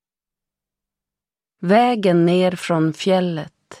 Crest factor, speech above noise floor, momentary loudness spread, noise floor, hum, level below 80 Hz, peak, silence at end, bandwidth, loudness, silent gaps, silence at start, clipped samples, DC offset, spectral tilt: 16 dB; 73 dB; 13 LU; -90 dBFS; 50 Hz at -45 dBFS; -66 dBFS; -4 dBFS; 0.05 s; 12.5 kHz; -17 LUFS; none; 1.6 s; under 0.1%; under 0.1%; -6.5 dB/octave